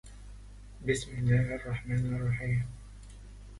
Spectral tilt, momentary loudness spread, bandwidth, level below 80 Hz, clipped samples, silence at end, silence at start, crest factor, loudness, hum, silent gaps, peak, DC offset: -6.5 dB/octave; 23 LU; 11.5 kHz; -48 dBFS; under 0.1%; 0 s; 0.05 s; 18 dB; -32 LUFS; 50 Hz at -45 dBFS; none; -16 dBFS; under 0.1%